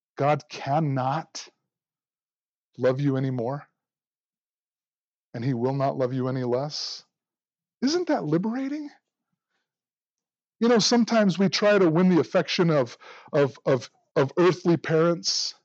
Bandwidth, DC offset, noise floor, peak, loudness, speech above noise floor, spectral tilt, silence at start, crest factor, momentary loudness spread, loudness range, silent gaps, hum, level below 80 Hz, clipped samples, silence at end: 8 kHz; under 0.1%; under -90 dBFS; -10 dBFS; -24 LUFS; over 66 dB; -5.5 dB/octave; 0.2 s; 16 dB; 12 LU; 9 LU; 2.42-2.73 s, 4.07-4.11 s, 4.20-4.31 s, 4.40-4.72 s, 4.97-5.32 s, 10.10-10.16 s, 14.11-14.15 s; none; -80 dBFS; under 0.1%; 0.15 s